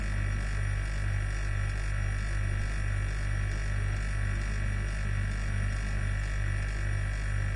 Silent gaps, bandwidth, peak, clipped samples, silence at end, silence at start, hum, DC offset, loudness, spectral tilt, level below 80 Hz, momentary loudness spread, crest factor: none; 11.5 kHz; -20 dBFS; under 0.1%; 0 s; 0 s; 50 Hz at -35 dBFS; under 0.1%; -33 LUFS; -5.5 dB/octave; -32 dBFS; 1 LU; 10 dB